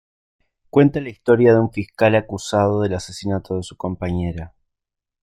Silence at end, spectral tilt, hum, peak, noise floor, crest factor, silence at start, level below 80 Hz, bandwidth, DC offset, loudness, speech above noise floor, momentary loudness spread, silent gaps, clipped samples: 0.75 s; -7 dB/octave; none; -2 dBFS; -84 dBFS; 18 dB; 0.75 s; -48 dBFS; 13 kHz; under 0.1%; -19 LUFS; 66 dB; 13 LU; none; under 0.1%